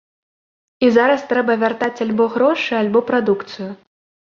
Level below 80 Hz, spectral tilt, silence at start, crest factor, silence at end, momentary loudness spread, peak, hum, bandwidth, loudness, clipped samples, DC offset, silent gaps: -62 dBFS; -6 dB/octave; 0.8 s; 16 dB; 0.5 s; 8 LU; -2 dBFS; none; 7.2 kHz; -17 LUFS; under 0.1%; under 0.1%; none